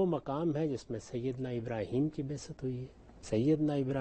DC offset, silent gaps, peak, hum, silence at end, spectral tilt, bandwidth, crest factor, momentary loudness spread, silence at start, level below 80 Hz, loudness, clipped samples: under 0.1%; none; -18 dBFS; none; 0 s; -7.5 dB/octave; 8.4 kHz; 14 dB; 10 LU; 0 s; -60 dBFS; -35 LUFS; under 0.1%